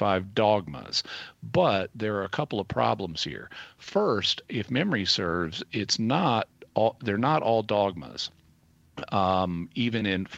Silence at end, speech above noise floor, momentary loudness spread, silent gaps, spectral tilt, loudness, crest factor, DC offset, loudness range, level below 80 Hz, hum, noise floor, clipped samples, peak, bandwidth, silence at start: 0 s; 34 dB; 10 LU; none; -5 dB/octave; -27 LUFS; 18 dB; under 0.1%; 2 LU; -58 dBFS; none; -61 dBFS; under 0.1%; -8 dBFS; 8.6 kHz; 0 s